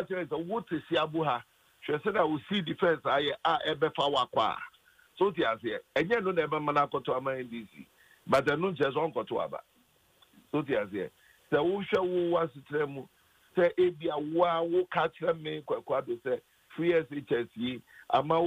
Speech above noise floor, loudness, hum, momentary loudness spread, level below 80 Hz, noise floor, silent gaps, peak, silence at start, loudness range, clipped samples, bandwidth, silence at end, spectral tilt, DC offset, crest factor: 37 dB; -30 LUFS; none; 9 LU; -68 dBFS; -67 dBFS; none; -14 dBFS; 0 s; 3 LU; under 0.1%; 15.5 kHz; 0 s; -6.5 dB/octave; under 0.1%; 16 dB